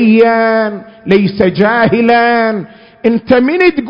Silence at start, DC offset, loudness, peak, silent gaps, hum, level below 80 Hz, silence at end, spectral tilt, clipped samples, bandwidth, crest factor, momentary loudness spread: 0 s; under 0.1%; -10 LUFS; 0 dBFS; none; none; -44 dBFS; 0 s; -8.5 dB/octave; 0.3%; 5.4 kHz; 10 dB; 8 LU